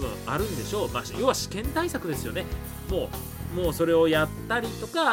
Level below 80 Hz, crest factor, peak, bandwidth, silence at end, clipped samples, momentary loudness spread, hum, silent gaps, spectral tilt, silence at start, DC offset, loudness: -40 dBFS; 18 dB; -8 dBFS; 17 kHz; 0 s; under 0.1%; 11 LU; none; none; -4.5 dB/octave; 0 s; under 0.1%; -27 LUFS